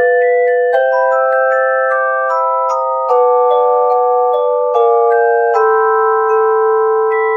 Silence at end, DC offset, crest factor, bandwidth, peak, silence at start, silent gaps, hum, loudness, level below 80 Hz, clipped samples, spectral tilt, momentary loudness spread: 0 s; under 0.1%; 10 dB; 7 kHz; 0 dBFS; 0 s; none; none; -12 LUFS; -74 dBFS; under 0.1%; -2 dB/octave; 3 LU